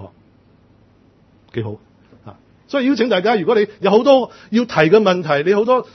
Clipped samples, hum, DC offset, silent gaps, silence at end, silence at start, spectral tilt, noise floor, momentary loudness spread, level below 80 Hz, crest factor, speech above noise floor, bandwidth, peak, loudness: under 0.1%; none; under 0.1%; none; 0.1 s; 0 s; -6.5 dB/octave; -52 dBFS; 15 LU; -62 dBFS; 18 dB; 37 dB; 6.4 kHz; 0 dBFS; -16 LUFS